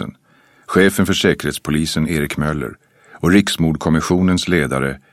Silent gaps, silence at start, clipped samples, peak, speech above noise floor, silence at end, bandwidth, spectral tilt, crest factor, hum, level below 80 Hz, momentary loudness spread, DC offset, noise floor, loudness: none; 0 s; under 0.1%; 0 dBFS; 37 dB; 0.15 s; 15.5 kHz; -5 dB/octave; 16 dB; none; -38 dBFS; 7 LU; under 0.1%; -53 dBFS; -17 LUFS